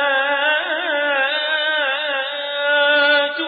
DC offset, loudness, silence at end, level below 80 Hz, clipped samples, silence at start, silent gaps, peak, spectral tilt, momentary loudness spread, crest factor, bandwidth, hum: under 0.1%; -17 LUFS; 0 s; -74 dBFS; under 0.1%; 0 s; none; -4 dBFS; -5 dB/octave; 7 LU; 14 dB; 4.9 kHz; none